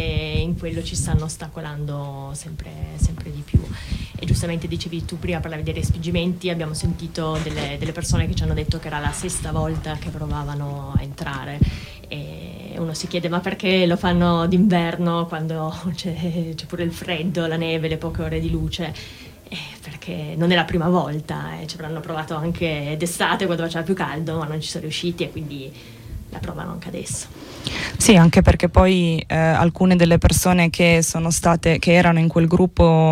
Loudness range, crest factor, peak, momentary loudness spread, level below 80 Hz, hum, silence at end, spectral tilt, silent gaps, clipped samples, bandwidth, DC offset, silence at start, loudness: 10 LU; 18 dB; -4 dBFS; 16 LU; -32 dBFS; none; 0 s; -5.5 dB/octave; none; under 0.1%; 16 kHz; under 0.1%; 0 s; -21 LUFS